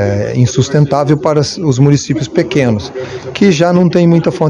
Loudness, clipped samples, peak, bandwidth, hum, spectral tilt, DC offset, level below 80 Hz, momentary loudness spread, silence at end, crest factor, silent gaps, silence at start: -11 LUFS; 1%; 0 dBFS; 10 kHz; none; -6.5 dB/octave; under 0.1%; -44 dBFS; 6 LU; 0 s; 10 dB; none; 0 s